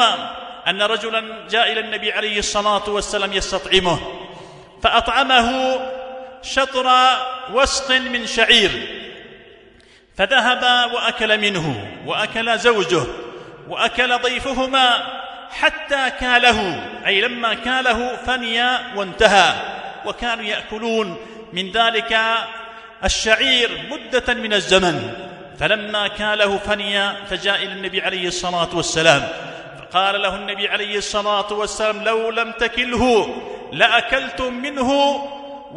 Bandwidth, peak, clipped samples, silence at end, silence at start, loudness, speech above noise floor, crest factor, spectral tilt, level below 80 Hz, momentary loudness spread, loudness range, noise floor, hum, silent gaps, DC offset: 11 kHz; 0 dBFS; under 0.1%; 0 s; 0 s; -18 LUFS; 31 dB; 20 dB; -2.5 dB/octave; -42 dBFS; 14 LU; 3 LU; -49 dBFS; none; none; under 0.1%